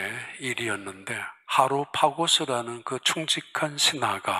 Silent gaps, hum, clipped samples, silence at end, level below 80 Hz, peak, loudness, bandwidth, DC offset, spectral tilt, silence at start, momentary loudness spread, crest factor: none; none; under 0.1%; 0 s; -74 dBFS; -4 dBFS; -25 LUFS; 16 kHz; under 0.1%; -2 dB/octave; 0 s; 11 LU; 22 dB